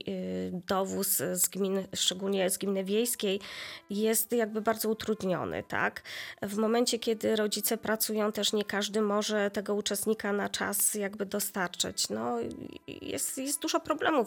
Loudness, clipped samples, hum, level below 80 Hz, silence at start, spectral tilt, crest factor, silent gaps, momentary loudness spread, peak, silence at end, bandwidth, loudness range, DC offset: -30 LUFS; under 0.1%; none; -70 dBFS; 0.05 s; -3 dB/octave; 18 dB; none; 8 LU; -12 dBFS; 0 s; 19 kHz; 2 LU; under 0.1%